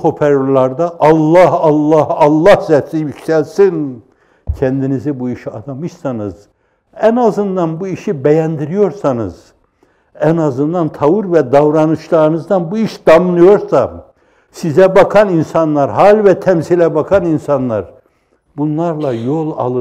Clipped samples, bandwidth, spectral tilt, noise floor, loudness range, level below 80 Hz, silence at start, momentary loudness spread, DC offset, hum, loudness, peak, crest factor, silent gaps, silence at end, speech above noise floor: under 0.1%; 13 kHz; -8 dB/octave; -56 dBFS; 7 LU; -42 dBFS; 0 s; 13 LU; under 0.1%; none; -12 LUFS; 0 dBFS; 12 dB; none; 0 s; 45 dB